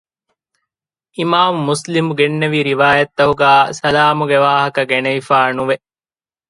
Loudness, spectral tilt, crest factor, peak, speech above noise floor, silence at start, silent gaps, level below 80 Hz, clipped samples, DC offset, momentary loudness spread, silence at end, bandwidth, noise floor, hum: -14 LUFS; -5 dB/octave; 16 dB; 0 dBFS; over 76 dB; 1.2 s; none; -52 dBFS; under 0.1%; under 0.1%; 7 LU; 0.75 s; 11.5 kHz; under -90 dBFS; none